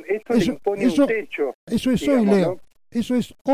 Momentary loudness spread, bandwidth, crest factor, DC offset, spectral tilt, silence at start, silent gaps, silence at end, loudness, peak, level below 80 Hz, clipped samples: 9 LU; 15.5 kHz; 14 dB; under 0.1%; -6.5 dB/octave; 0 s; 1.54-1.67 s, 3.41-3.45 s; 0 s; -21 LUFS; -6 dBFS; -50 dBFS; under 0.1%